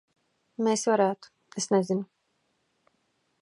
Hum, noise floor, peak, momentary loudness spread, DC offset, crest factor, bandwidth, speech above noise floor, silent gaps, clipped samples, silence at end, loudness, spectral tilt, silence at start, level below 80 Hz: none; -74 dBFS; -10 dBFS; 18 LU; under 0.1%; 20 dB; 11.5 kHz; 48 dB; none; under 0.1%; 1.35 s; -27 LUFS; -4.5 dB/octave; 0.6 s; -80 dBFS